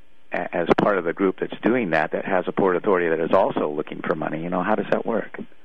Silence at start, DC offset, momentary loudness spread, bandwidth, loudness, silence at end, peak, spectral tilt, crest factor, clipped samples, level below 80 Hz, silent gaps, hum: 0.3 s; 1%; 7 LU; 7.2 kHz; -23 LUFS; 0.2 s; -6 dBFS; -8 dB/octave; 18 dB; under 0.1%; -56 dBFS; none; none